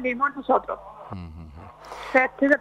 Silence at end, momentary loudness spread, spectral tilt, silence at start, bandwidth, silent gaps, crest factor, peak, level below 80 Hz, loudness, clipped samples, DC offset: 0 s; 22 LU; -6.5 dB/octave; 0 s; 11 kHz; none; 20 dB; -6 dBFS; -52 dBFS; -23 LUFS; under 0.1%; under 0.1%